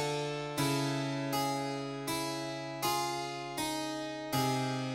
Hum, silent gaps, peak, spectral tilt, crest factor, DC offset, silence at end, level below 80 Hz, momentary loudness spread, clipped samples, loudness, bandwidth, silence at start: none; none; -18 dBFS; -4.5 dB/octave; 16 dB; under 0.1%; 0 s; -66 dBFS; 6 LU; under 0.1%; -34 LUFS; 16.5 kHz; 0 s